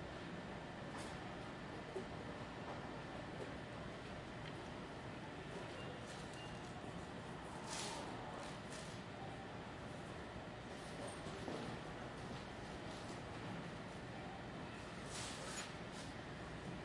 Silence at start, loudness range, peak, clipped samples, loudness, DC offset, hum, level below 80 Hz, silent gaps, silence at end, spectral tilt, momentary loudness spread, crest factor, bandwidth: 0 s; 1 LU; -30 dBFS; under 0.1%; -49 LUFS; under 0.1%; none; -64 dBFS; none; 0 s; -4.5 dB/octave; 4 LU; 18 dB; 11.5 kHz